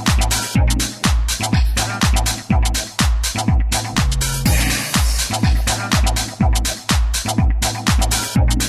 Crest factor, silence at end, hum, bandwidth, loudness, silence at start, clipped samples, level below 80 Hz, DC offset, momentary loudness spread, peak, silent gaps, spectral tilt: 14 dB; 0 s; none; 15.5 kHz; -18 LUFS; 0 s; under 0.1%; -20 dBFS; under 0.1%; 2 LU; -2 dBFS; none; -3.5 dB/octave